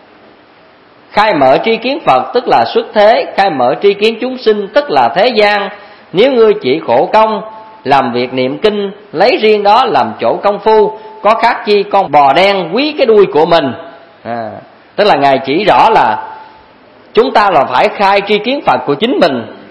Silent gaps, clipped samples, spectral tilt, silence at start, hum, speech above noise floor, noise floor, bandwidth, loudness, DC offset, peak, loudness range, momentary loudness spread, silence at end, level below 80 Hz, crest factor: none; 0.6%; -6 dB/octave; 1.15 s; none; 32 dB; -42 dBFS; 11 kHz; -10 LUFS; 0.2%; 0 dBFS; 2 LU; 11 LU; 0.1 s; -48 dBFS; 10 dB